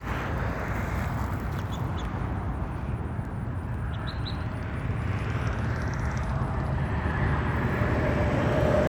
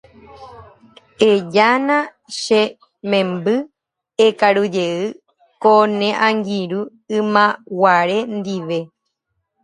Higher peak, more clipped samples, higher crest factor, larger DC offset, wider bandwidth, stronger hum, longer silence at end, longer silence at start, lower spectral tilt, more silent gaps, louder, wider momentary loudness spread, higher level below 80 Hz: second, -10 dBFS vs 0 dBFS; neither; about the same, 18 dB vs 18 dB; neither; first, 20 kHz vs 11 kHz; neither; second, 0 s vs 0.75 s; second, 0 s vs 0.4 s; first, -7.5 dB/octave vs -5 dB/octave; neither; second, -29 LUFS vs -17 LUFS; second, 7 LU vs 12 LU; first, -34 dBFS vs -64 dBFS